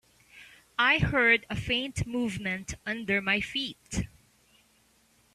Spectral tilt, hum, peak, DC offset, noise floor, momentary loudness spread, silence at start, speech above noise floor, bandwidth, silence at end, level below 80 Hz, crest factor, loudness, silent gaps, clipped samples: -4 dB/octave; none; -10 dBFS; under 0.1%; -65 dBFS; 13 LU; 0.35 s; 37 dB; 14 kHz; 1.3 s; -48 dBFS; 20 dB; -28 LUFS; none; under 0.1%